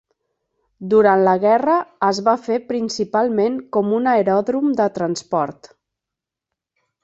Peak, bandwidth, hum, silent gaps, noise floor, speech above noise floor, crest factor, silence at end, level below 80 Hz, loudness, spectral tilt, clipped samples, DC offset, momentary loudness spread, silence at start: -2 dBFS; 8 kHz; none; none; -85 dBFS; 68 dB; 18 dB; 1.5 s; -64 dBFS; -18 LUFS; -6 dB/octave; under 0.1%; under 0.1%; 8 LU; 0.8 s